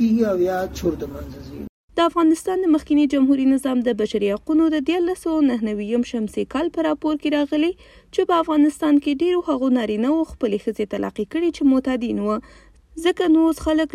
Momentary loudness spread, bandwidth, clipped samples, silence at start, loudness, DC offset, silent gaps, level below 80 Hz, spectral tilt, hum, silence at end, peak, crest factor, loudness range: 8 LU; 14 kHz; under 0.1%; 0 s; -20 LUFS; under 0.1%; 1.69-1.88 s; -46 dBFS; -6 dB/octave; none; 0.05 s; -6 dBFS; 14 dB; 3 LU